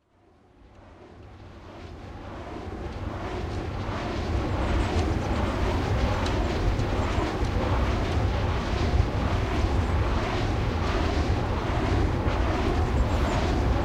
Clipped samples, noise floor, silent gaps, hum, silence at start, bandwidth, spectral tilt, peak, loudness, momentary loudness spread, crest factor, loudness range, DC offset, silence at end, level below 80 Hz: under 0.1%; -59 dBFS; none; none; 0.8 s; 10.5 kHz; -6.5 dB/octave; -10 dBFS; -27 LUFS; 13 LU; 16 dB; 9 LU; under 0.1%; 0 s; -30 dBFS